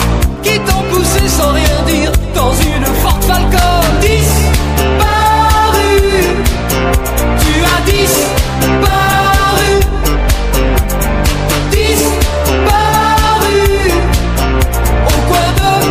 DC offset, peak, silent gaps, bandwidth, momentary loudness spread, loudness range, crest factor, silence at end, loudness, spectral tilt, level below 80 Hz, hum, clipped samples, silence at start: under 0.1%; 0 dBFS; none; 16 kHz; 4 LU; 1 LU; 10 dB; 0 s; -11 LUFS; -4.5 dB/octave; -14 dBFS; none; under 0.1%; 0 s